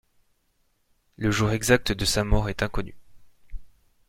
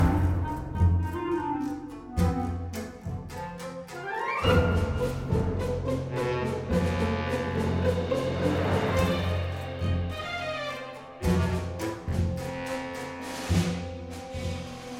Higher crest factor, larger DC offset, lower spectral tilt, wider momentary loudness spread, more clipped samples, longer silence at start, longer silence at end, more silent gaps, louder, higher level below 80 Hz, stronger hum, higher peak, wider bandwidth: about the same, 22 dB vs 18 dB; neither; second, -4.5 dB/octave vs -6.5 dB/octave; second, 9 LU vs 12 LU; neither; first, 1.2 s vs 0 s; first, 0.4 s vs 0 s; neither; first, -24 LUFS vs -29 LUFS; about the same, -36 dBFS vs -38 dBFS; neither; first, -6 dBFS vs -10 dBFS; about the same, 16.5 kHz vs 15.5 kHz